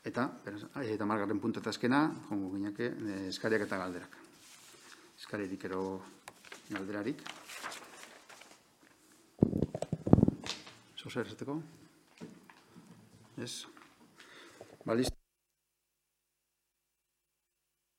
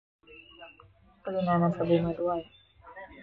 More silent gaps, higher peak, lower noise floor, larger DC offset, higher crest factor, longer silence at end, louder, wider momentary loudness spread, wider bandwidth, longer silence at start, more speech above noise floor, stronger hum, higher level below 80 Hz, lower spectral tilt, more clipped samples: neither; first, -6 dBFS vs -12 dBFS; first, -85 dBFS vs -49 dBFS; neither; first, 32 dB vs 18 dB; first, 2.8 s vs 0 s; second, -36 LUFS vs -28 LUFS; about the same, 23 LU vs 24 LU; first, 16.5 kHz vs 4.7 kHz; second, 0.05 s vs 0.3 s; first, 49 dB vs 20 dB; neither; about the same, -58 dBFS vs -58 dBFS; second, -6 dB/octave vs -10 dB/octave; neither